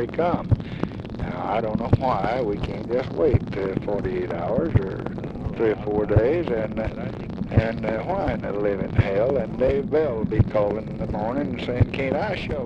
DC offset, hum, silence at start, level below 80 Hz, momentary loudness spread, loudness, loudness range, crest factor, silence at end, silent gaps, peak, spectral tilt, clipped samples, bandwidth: under 0.1%; none; 0 s; -38 dBFS; 8 LU; -24 LUFS; 1 LU; 20 dB; 0 s; none; -4 dBFS; -9.5 dB/octave; under 0.1%; 7 kHz